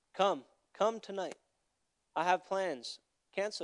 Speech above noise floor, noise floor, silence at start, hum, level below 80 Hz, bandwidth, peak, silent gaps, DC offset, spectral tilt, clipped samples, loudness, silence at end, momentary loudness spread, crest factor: 48 dB; -82 dBFS; 0.15 s; none; under -90 dBFS; 11 kHz; -14 dBFS; none; under 0.1%; -3.5 dB/octave; under 0.1%; -36 LUFS; 0 s; 12 LU; 22 dB